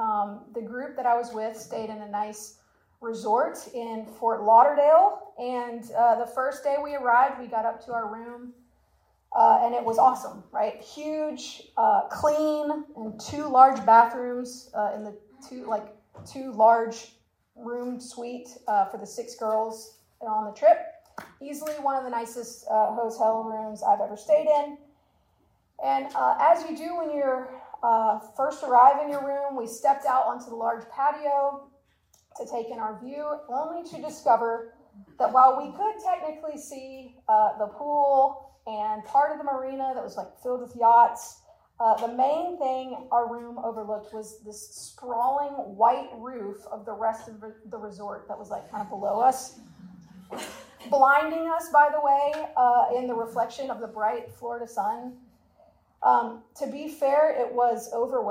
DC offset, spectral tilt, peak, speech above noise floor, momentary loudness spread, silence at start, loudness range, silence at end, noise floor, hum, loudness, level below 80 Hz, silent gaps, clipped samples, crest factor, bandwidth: under 0.1%; -4 dB/octave; -4 dBFS; 42 dB; 19 LU; 0 s; 8 LU; 0 s; -67 dBFS; none; -25 LUFS; -70 dBFS; none; under 0.1%; 22 dB; 16 kHz